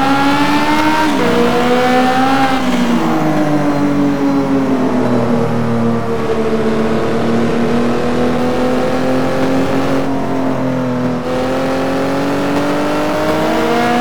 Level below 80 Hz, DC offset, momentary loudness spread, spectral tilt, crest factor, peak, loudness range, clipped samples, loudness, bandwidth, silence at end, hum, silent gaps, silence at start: -38 dBFS; 10%; 4 LU; -6 dB/octave; 12 dB; -2 dBFS; 3 LU; under 0.1%; -14 LUFS; 19 kHz; 0 s; none; none; 0 s